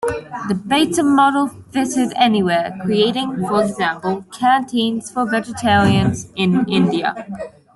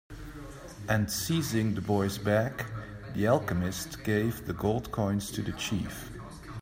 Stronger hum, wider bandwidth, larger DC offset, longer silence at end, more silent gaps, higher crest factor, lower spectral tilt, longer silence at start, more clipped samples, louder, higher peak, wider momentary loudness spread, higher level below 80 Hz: neither; second, 12 kHz vs 16 kHz; neither; first, 0.25 s vs 0 s; neither; about the same, 16 dB vs 20 dB; about the same, -5 dB/octave vs -5.5 dB/octave; about the same, 0 s vs 0.1 s; neither; first, -17 LUFS vs -30 LUFS; first, -2 dBFS vs -12 dBFS; second, 10 LU vs 15 LU; about the same, -50 dBFS vs -50 dBFS